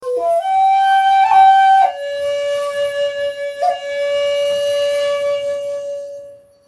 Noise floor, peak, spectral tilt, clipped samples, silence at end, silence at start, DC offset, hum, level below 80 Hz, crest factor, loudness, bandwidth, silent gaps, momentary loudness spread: -38 dBFS; -2 dBFS; -1 dB/octave; under 0.1%; 0.3 s; 0 s; under 0.1%; none; -64 dBFS; 14 dB; -15 LUFS; 12.5 kHz; none; 13 LU